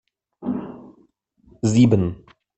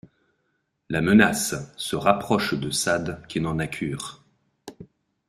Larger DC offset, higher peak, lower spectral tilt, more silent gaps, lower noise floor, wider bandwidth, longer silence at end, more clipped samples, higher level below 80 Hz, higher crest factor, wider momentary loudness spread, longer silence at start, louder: neither; about the same, -4 dBFS vs -2 dBFS; first, -7.5 dB/octave vs -4.5 dB/octave; neither; second, -59 dBFS vs -73 dBFS; second, 8.6 kHz vs 15.5 kHz; about the same, 0.4 s vs 0.45 s; neither; about the same, -52 dBFS vs -54 dBFS; about the same, 20 dB vs 24 dB; first, 20 LU vs 14 LU; second, 0.4 s vs 0.9 s; first, -20 LUFS vs -23 LUFS